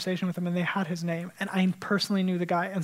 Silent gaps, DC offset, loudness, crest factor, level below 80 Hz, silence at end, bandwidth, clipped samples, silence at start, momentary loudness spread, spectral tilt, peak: none; under 0.1%; -28 LUFS; 14 dB; -74 dBFS; 0 s; 15.5 kHz; under 0.1%; 0 s; 5 LU; -6 dB/octave; -14 dBFS